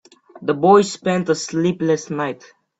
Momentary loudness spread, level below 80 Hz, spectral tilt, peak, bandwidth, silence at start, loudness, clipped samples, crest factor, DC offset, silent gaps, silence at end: 13 LU; -62 dBFS; -5.5 dB/octave; -2 dBFS; 8.2 kHz; 0.35 s; -19 LUFS; under 0.1%; 18 dB; under 0.1%; none; 0.45 s